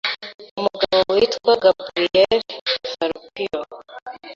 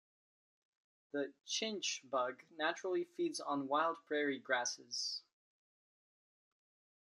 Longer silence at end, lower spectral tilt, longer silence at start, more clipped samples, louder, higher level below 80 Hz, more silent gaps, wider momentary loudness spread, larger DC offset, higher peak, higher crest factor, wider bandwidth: second, 0 s vs 1.9 s; first, -4 dB/octave vs -1.5 dB/octave; second, 0.05 s vs 1.15 s; neither; first, -20 LUFS vs -39 LUFS; first, -56 dBFS vs under -90 dBFS; first, 0.34-0.39 s, 0.51-0.57 s, 2.61-2.66 s, 4.02-4.06 s vs none; first, 17 LU vs 7 LU; neither; first, -2 dBFS vs -20 dBFS; about the same, 18 dB vs 22 dB; second, 7.4 kHz vs 12 kHz